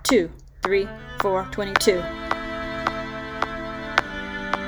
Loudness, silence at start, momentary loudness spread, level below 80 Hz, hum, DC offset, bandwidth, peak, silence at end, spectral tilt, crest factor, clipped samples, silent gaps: -25 LUFS; 0 s; 10 LU; -42 dBFS; none; under 0.1%; over 20 kHz; 0 dBFS; 0 s; -3.5 dB/octave; 24 dB; under 0.1%; none